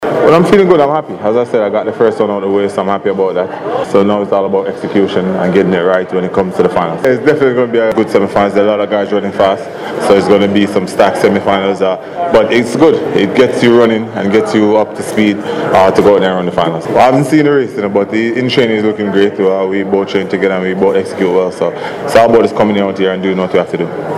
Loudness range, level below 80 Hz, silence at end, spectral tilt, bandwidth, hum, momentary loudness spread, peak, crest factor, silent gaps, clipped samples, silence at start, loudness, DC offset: 3 LU; -48 dBFS; 0 s; -6.5 dB/octave; 13 kHz; none; 6 LU; 0 dBFS; 10 dB; none; 0.4%; 0 s; -11 LUFS; under 0.1%